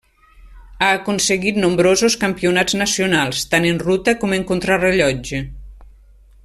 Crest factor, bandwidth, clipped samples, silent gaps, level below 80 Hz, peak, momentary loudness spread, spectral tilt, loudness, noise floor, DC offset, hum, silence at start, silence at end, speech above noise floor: 16 dB; 14 kHz; under 0.1%; none; -42 dBFS; -2 dBFS; 5 LU; -3.5 dB/octave; -17 LUFS; -46 dBFS; under 0.1%; none; 0.45 s; 0.55 s; 30 dB